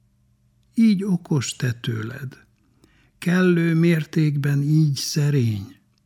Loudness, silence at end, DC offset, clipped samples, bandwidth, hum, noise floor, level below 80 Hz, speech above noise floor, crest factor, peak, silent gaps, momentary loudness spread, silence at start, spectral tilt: -21 LUFS; 0.35 s; under 0.1%; under 0.1%; 17 kHz; none; -62 dBFS; -64 dBFS; 42 dB; 14 dB; -6 dBFS; none; 12 LU; 0.75 s; -6.5 dB/octave